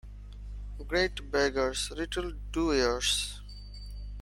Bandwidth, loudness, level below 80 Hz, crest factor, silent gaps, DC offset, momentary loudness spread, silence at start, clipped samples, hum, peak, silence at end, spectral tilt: 16.5 kHz; -30 LUFS; -42 dBFS; 20 dB; none; under 0.1%; 18 LU; 0.05 s; under 0.1%; 50 Hz at -40 dBFS; -12 dBFS; 0 s; -3 dB/octave